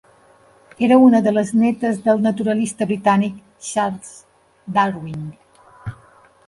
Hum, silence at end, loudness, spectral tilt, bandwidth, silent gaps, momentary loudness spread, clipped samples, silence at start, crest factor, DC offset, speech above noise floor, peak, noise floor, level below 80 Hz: none; 0.55 s; -18 LUFS; -6 dB/octave; 11.5 kHz; none; 22 LU; under 0.1%; 0.8 s; 16 dB; under 0.1%; 35 dB; -2 dBFS; -52 dBFS; -56 dBFS